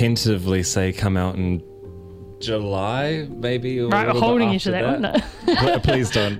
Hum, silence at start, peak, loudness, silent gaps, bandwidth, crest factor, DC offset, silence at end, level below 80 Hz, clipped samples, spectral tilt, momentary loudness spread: none; 0 s; -4 dBFS; -21 LUFS; none; 16 kHz; 16 dB; under 0.1%; 0 s; -40 dBFS; under 0.1%; -5.5 dB/octave; 11 LU